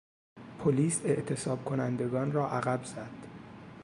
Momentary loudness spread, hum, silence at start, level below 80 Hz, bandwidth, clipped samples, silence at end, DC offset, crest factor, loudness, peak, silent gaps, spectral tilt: 19 LU; none; 0.35 s; -66 dBFS; 11.5 kHz; under 0.1%; 0 s; under 0.1%; 18 dB; -31 LUFS; -14 dBFS; none; -6 dB/octave